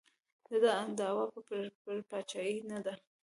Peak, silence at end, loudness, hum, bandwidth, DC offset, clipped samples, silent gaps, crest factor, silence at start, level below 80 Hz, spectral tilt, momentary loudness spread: -18 dBFS; 0.3 s; -37 LUFS; none; 11.5 kHz; under 0.1%; under 0.1%; 1.75-1.85 s; 20 dB; 0.5 s; -86 dBFS; -4 dB/octave; 11 LU